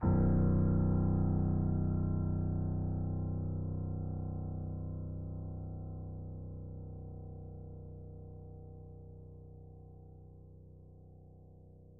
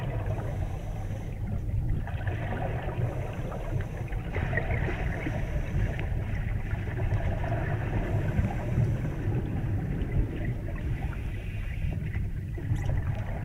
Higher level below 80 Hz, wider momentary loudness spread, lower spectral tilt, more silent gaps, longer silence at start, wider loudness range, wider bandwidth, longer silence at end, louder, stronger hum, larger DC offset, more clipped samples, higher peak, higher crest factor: second, -46 dBFS vs -34 dBFS; first, 25 LU vs 6 LU; first, -11.5 dB/octave vs -8 dB/octave; neither; about the same, 0 s vs 0 s; first, 20 LU vs 3 LU; second, 2 kHz vs 13 kHz; about the same, 0 s vs 0 s; second, -36 LUFS vs -32 LUFS; neither; neither; neither; second, -20 dBFS vs -14 dBFS; about the same, 16 dB vs 16 dB